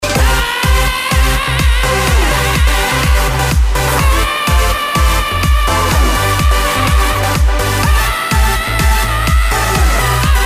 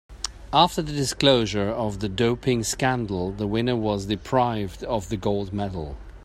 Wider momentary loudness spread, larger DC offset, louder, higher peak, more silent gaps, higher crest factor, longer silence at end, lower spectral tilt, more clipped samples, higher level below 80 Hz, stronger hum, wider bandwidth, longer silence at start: second, 1 LU vs 10 LU; neither; first, -12 LUFS vs -24 LUFS; about the same, -2 dBFS vs -2 dBFS; neither; second, 8 dB vs 22 dB; about the same, 0 s vs 0 s; about the same, -4 dB/octave vs -5 dB/octave; neither; first, -14 dBFS vs -42 dBFS; neither; about the same, 15.5 kHz vs 16 kHz; about the same, 0 s vs 0.1 s